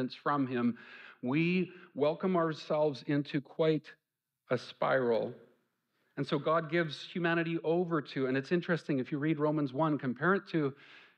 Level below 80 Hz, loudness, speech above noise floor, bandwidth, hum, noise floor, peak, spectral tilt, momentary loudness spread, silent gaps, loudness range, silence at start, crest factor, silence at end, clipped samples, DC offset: -78 dBFS; -33 LUFS; 46 dB; 8.6 kHz; none; -78 dBFS; -16 dBFS; -8 dB/octave; 7 LU; none; 2 LU; 0 s; 18 dB; 0.2 s; under 0.1%; under 0.1%